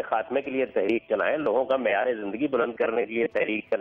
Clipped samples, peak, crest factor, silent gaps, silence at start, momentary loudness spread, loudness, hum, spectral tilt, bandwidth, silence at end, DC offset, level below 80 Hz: under 0.1%; -12 dBFS; 14 dB; none; 0 s; 3 LU; -26 LUFS; none; -7.5 dB/octave; 5.4 kHz; 0 s; under 0.1%; -66 dBFS